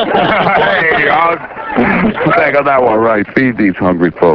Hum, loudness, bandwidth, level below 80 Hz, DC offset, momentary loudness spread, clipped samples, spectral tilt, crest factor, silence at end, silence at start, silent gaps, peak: none; -11 LUFS; 5.4 kHz; -40 dBFS; under 0.1%; 4 LU; 0.1%; -8.5 dB/octave; 10 dB; 0 s; 0 s; none; 0 dBFS